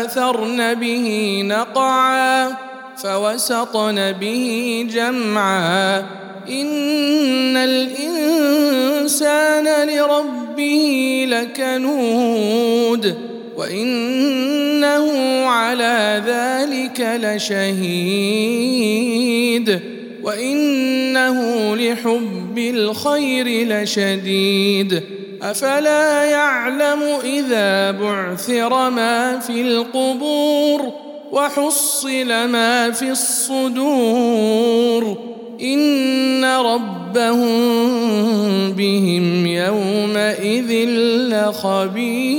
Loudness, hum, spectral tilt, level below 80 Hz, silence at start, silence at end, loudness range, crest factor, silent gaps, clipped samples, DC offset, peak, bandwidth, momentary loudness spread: -17 LUFS; none; -3.5 dB/octave; -76 dBFS; 0 s; 0 s; 2 LU; 16 dB; none; under 0.1%; under 0.1%; -2 dBFS; 17.5 kHz; 6 LU